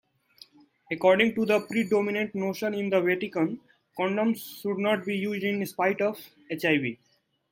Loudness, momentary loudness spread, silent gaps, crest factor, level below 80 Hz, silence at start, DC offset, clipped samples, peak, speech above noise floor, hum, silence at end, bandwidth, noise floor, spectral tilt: -27 LUFS; 11 LU; none; 20 dB; -72 dBFS; 0.9 s; under 0.1%; under 0.1%; -6 dBFS; 30 dB; none; 0.55 s; 16.5 kHz; -56 dBFS; -6 dB/octave